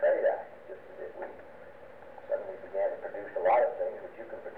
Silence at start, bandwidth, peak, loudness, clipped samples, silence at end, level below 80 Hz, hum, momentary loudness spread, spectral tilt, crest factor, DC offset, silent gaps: 0 s; 4.2 kHz; -16 dBFS; -32 LUFS; under 0.1%; 0 s; -72 dBFS; none; 22 LU; -6.5 dB/octave; 16 dB; 0.2%; none